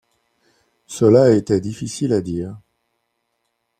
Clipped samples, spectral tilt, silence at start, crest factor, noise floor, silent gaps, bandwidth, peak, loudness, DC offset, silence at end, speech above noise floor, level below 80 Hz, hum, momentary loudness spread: under 0.1%; -7 dB/octave; 0.9 s; 18 dB; -72 dBFS; none; 14 kHz; -2 dBFS; -17 LUFS; under 0.1%; 1.2 s; 56 dB; -54 dBFS; none; 16 LU